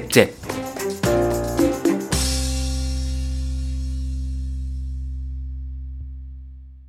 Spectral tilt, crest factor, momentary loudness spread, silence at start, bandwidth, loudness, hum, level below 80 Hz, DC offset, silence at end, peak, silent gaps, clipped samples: -5 dB/octave; 24 dB; 15 LU; 0 s; 16.5 kHz; -24 LUFS; none; -28 dBFS; under 0.1%; 0 s; 0 dBFS; none; under 0.1%